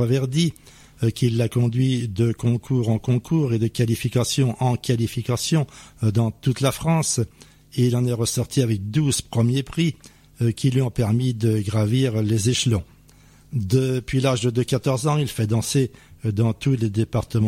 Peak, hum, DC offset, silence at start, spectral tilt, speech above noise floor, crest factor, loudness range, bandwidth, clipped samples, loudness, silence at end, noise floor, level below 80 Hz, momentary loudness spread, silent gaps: -6 dBFS; none; under 0.1%; 0 s; -6 dB/octave; 30 dB; 14 dB; 1 LU; 15.5 kHz; under 0.1%; -22 LUFS; 0 s; -51 dBFS; -48 dBFS; 5 LU; none